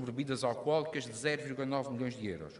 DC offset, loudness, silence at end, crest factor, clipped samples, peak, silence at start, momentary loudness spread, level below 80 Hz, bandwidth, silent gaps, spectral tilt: under 0.1%; -35 LUFS; 0 s; 18 dB; under 0.1%; -18 dBFS; 0 s; 5 LU; -70 dBFS; 11.5 kHz; none; -5 dB/octave